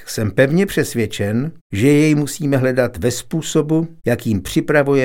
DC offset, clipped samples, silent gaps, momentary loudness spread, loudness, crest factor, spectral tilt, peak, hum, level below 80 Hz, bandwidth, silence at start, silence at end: under 0.1%; under 0.1%; 1.61-1.70 s; 6 LU; -17 LUFS; 16 dB; -6 dB/octave; 0 dBFS; none; -44 dBFS; 17 kHz; 0 s; 0 s